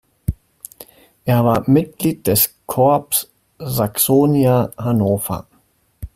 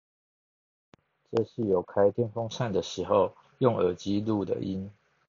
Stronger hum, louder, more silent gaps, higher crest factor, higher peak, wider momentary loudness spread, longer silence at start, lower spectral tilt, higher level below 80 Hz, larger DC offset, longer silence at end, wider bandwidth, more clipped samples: neither; first, -17 LUFS vs -29 LUFS; neither; about the same, 18 dB vs 22 dB; first, 0 dBFS vs -8 dBFS; first, 20 LU vs 7 LU; second, 0.3 s vs 1.3 s; about the same, -5.5 dB/octave vs -6.5 dB/octave; first, -40 dBFS vs -66 dBFS; neither; second, 0.1 s vs 0.35 s; first, 16 kHz vs 7.4 kHz; neither